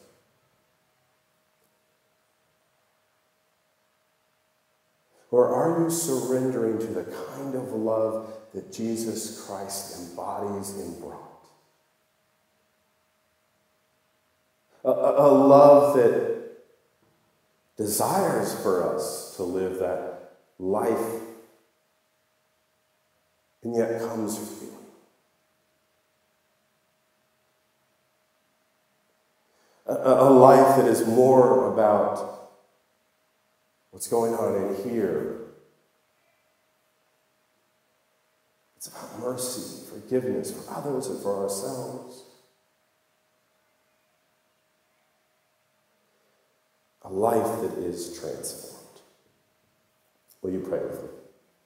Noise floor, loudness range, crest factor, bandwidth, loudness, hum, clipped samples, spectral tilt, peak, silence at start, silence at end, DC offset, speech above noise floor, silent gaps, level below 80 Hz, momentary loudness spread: -70 dBFS; 17 LU; 26 dB; 16 kHz; -23 LUFS; none; under 0.1%; -5.5 dB/octave; 0 dBFS; 5.3 s; 0.5 s; under 0.1%; 47 dB; none; -72 dBFS; 22 LU